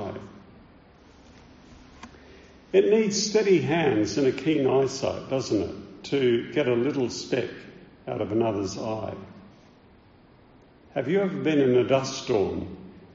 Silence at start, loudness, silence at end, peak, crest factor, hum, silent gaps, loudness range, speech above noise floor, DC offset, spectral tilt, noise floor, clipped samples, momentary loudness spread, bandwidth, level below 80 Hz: 0 s; -25 LUFS; 0.1 s; -8 dBFS; 18 dB; none; none; 8 LU; 30 dB; under 0.1%; -5 dB/octave; -54 dBFS; under 0.1%; 16 LU; 7.6 kHz; -58 dBFS